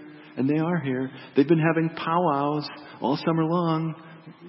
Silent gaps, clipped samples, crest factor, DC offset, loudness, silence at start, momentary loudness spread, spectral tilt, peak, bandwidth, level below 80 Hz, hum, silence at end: none; under 0.1%; 18 dB; under 0.1%; -25 LUFS; 0 s; 10 LU; -11.5 dB/octave; -6 dBFS; 5.8 kHz; -70 dBFS; none; 0 s